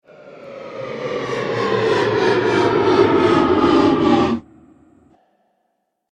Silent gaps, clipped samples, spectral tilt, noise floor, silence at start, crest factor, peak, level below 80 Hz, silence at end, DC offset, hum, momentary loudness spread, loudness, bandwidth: none; under 0.1%; -6.5 dB/octave; -71 dBFS; 0.25 s; 16 dB; -2 dBFS; -48 dBFS; 1.7 s; under 0.1%; none; 15 LU; -16 LUFS; 9.6 kHz